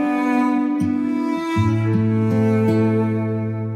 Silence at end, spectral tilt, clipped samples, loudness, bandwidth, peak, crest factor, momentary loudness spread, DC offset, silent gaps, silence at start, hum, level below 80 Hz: 0 s; -8.5 dB/octave; under 0.1%; -19 LUFS; 9.8 kHz; -8 dBFS; 12 dB; 4 LU; under 0.1%; none; 0 s; none; -54 dBFS